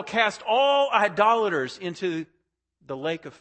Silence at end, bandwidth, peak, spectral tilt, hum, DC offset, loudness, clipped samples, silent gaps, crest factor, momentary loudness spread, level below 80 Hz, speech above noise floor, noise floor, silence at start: 0.1 s; 8.8 kHz; -6 dBFS; -4 dB/octave; none; under 0.1%; -23 LUFS; under 0.1%; none; 20 dB; 12 LU; -72 dBFS; 45 dB; -69 dBFS; 0 s